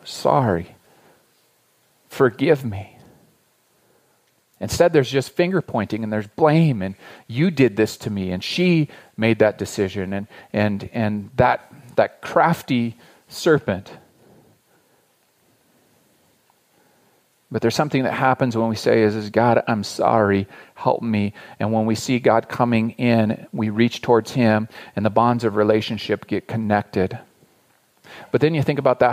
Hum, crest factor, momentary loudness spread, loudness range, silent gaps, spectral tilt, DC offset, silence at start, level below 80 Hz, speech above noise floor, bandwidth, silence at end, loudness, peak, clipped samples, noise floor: none; 18 dB; 10 LU; 6 LU; none; -6.5 dB/octave; under 0.1%; 0.05 s; -56 dBFS; 43 dB; 15.5 kHz; 0 s; -20 LUFS; -2 dBFS; under 0.1%; -62 dBFS